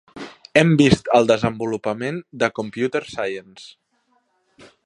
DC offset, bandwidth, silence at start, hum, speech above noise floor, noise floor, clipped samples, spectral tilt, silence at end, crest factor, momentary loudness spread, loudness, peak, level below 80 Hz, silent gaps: under 0.1%; 11 kHz; 0.15 s; none; 46 dB; -66 dBFS; under 0.1%; -6 dB/octave; 1.2 s; 20 dB; 13 LU; -19 LUFS; 0 dBFS; -48 dBFS; none